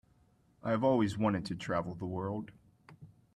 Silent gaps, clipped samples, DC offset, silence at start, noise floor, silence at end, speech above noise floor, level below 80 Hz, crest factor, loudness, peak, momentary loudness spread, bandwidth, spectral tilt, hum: none; under 0.1%; under 0.1%; 0.65 s; -68 dBFS; 0.3 s; 35 dB; -64 dBFS; 18 dB; -34 LUFS; -18 dBFS; 12 LU; 11.5 kHz; -7.5 dB/octave; none